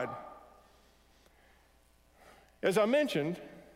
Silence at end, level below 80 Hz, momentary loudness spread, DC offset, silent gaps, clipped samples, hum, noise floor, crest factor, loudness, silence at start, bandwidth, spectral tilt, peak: 0.15 s; -68 dBFS; 22 LU; under 0.1%; none; under 0.1%; none; -65 dBFS; 20 dB; -31 LUFS; 0 s; 16 kHz; -5.5 dB/octave; -16 dBFS